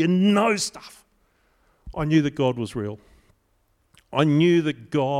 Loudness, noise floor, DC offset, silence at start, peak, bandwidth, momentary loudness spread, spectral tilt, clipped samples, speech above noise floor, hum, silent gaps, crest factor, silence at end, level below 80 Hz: -22 LUFS; -66 dBFS; under 0.1%; 0 s; -6 dBFS; 14.5 kHz; 15 LU; -6 dB/octave; under 0.1%; 45 dB; none; none; 18 dB; 0 s; -52 dBFS